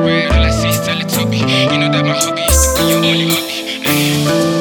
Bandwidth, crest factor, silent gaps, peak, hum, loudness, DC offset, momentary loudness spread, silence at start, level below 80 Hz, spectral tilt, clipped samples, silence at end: over 20 kHz; 12 dB; none; 0 dBFS; none; -13 LUFS; under 0.1%; 4 LU; 0 s; -22 dBFS; -4 dB/octave; under 0.1%; 0 s